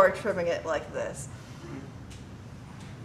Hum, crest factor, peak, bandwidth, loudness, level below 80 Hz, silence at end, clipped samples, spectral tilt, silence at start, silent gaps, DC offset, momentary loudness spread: none; 24 dB; -6 dBFS; 13.5 kHz; -32 LUFS; -54 dBFS; 0 s; under 0.1%; -5 dB/octave; 0 s; none; under 0.1%; 16 LU